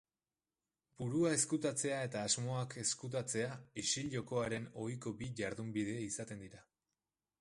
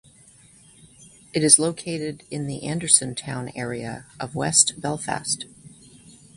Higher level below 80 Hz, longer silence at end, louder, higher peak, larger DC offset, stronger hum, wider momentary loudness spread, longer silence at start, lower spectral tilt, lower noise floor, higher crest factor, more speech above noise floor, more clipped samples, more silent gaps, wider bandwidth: second, -70 dBFS vs -58 dBFS; first, 0.8 s vs 0.25 s; second, -39 LUFS vs -21 LUFS; second, -20 dBFS vs 0 dBFS; neither; neither; second, 10 LU vs 17 LU; about the same, 1 s vs 1 s; first, -4 dB/octave vs -2.5 dB/octave; first, under -90 dBFS vs -52 dBFS; second, 20 dB vs 26 dB; first, over 51 dB vs 29 dB; neither; neither; about the same, 11.5 kHz vs 11.5 kHz